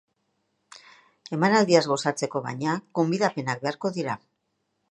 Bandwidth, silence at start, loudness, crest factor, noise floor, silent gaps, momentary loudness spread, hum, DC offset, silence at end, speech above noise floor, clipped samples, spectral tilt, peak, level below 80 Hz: 11.5 kHz; 0.75 s; -25 LUFS; 22 dB; -76 dBFS; none; 11 LU; none; under 0.1%; 0.75 s; 52 dB; under 0.1%; -5 dB/octave; -4 dBFS; -72 dBFS